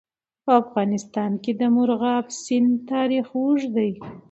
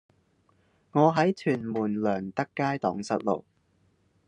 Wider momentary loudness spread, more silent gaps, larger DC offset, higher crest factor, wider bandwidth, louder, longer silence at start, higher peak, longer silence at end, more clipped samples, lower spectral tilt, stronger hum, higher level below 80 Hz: about the same, 6 LU vs 8 LU; neither; neither; about the same, 18 dB vs 20 dB; second, 8.2 kHz vs 10 kHz; first, -22 LUFS vs -27 LUFS; second, 0.45 s vs 0.95 s; first, -4 dBFS vs -8 dBFS; second, 0.1 s vs 0.85 s; neither; about the same, -6 dB/octave vs -7 dB/octave; neither; first, -66 dBFS vs -72 dBFS